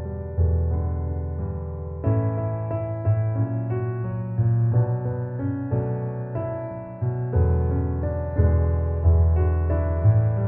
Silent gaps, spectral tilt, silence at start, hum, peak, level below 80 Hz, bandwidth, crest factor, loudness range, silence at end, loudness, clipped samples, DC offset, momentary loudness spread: none; -14.5 dB/octave; 0 s; none; -8 dBFS; -30 dBFS; 2.8 kHz; 14 dB; 4 LU; 0 s; -24 LUFS; under 0.1%; under 0.1%; 9 LU